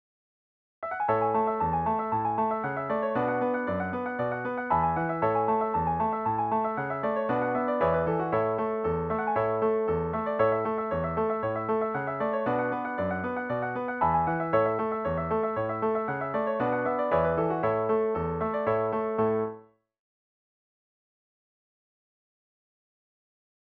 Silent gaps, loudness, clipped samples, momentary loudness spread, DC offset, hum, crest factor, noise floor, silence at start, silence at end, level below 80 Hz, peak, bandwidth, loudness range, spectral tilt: none; -28 LUFS; under 0.1%; 5 LU; under 0.1%; none; 16 dB; -49 dBFS; 0.8 s; 4 s; -54 dBFS; -12 dBFS; 4.6 kHz; 2 LU; -10 dB/octave